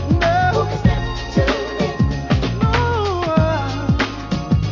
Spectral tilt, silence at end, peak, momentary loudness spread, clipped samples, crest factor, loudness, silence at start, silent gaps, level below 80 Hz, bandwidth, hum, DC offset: -7 dB/octave; 0 s; -2 dBFS; 5 LU; under 0.1%; 16 dB; -19 LUFS; 0 s; none; -26 dBFS; 7.4 kHz; none; under 0.1%